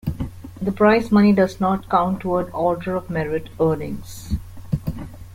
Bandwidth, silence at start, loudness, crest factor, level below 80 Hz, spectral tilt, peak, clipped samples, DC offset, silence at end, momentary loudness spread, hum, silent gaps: 16 kHz; 0.05 s; -21 LUFS; 18 dB; -38 dBFS; -7.5 dB/octave; -4 dBFS; under 0.1%; under 0.1%; 0 s; 16 LU; none; none